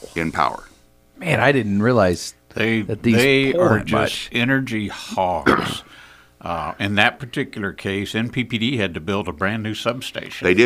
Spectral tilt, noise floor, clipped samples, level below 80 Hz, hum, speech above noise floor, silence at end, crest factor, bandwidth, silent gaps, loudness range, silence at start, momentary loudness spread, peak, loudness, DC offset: -5.5 dB/octave; -49 dBFS; under 0.1%; -48 dBFS; none; 29 dB; 0 s; 20 dB; 15.5 kHz; none; 5 LU; 0 s; 11 LU; 0 dBFS; -20 LUFS; under 0.1%